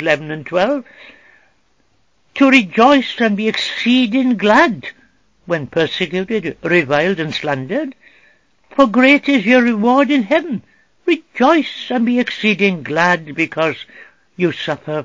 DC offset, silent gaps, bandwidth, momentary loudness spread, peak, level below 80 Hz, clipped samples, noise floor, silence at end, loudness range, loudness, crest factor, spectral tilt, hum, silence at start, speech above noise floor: 0.2%; none; 7.6 kHz; 12 LU; 0 dBFS; -58 dBFS; under 0.1%; -61 dBFS; 0 s; 4 LU; -15 LUFS; 16 dB; -5.5 dB/octave; none; 0 s; 46 dB